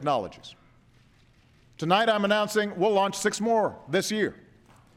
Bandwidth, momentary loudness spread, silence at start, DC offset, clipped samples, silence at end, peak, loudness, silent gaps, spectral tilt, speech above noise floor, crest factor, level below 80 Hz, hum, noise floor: 16 kHz; 11 LU; 0 s; under 0.1%; under 0.1%; 0.6 s; -10 dBFS; -25 LUFS; none; -4 dB/octave; 34 dB; 18 dB; -66 dBFS; none; -59 dBFS